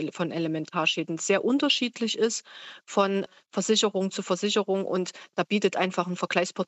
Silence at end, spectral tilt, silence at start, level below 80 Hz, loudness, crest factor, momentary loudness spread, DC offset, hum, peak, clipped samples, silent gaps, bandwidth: 0.05 s; -3.5 dB/octave; 0 s; -84 dBFS; -26 LUFS; 18 dB; 8 LU; under 0.1%; none; -8 dBFS; under 0.1%; none; 8.4 kHz